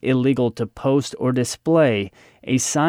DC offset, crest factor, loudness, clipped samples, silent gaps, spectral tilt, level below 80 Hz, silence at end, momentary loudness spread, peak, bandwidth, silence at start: under 0.1%; 14 dB; -20 LUFS; under 0.1%; none; -5.5 dB/octave; -56 dBFS; 0 s; 8 LU; -6 dBFS; 16 kHz; 0.05 s